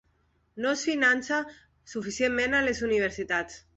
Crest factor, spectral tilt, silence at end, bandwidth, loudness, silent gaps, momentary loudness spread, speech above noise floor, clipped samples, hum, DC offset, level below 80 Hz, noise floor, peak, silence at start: 18 dB; -3 dB/octave; 0.2 s; 8.4 kHz; -27 LUFS; none; 12 LU; 41 dB; under 0.1%; none; under 0.1%; -56 dBFS; -69 dBFS; -10 dBFS; 0.55 s